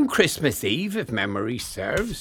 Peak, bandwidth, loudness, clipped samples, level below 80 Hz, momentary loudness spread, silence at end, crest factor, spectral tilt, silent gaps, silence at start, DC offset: -4 dBFS; 19 kHz; -24 LUFS; under 0.1%; -46 dBFS; 8 LU; 0 s; 20 dB; -4 dB/octave; none; 0 s; under 0.1%